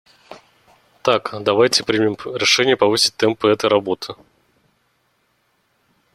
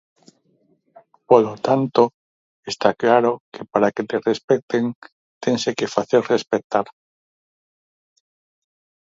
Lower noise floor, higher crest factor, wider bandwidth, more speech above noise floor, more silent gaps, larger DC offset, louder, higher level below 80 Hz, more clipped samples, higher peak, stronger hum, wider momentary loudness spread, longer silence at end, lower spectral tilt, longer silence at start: about the same, -65 dBFS vs -63 dBFS; about the same, 20 dB vs 22 dB; first, 14.5 kHz vs 7.8 kHz; about the same, 47 dB vs 44 dB; second, none vs 2.14-2.63 s, 3.40-3.52 s, 4.44-4.48 s, 4.63-4.68 s, 4.95-5.02 s, 5.12-5.41 s, 6.64-6.70 s; neither; first, -17 LUFS vs -20 LUFS; first, -60 dBFS vs -66 dBFS; neither; about the same, 0 dBFS vs 0 dBFS; neither; about the same, 9 LU vs 11 LU; second, 2 s vs 2.2 s; second, -3 dB/octave vs -5.5 dB/octave; second, 0.3 s vs 1.3 s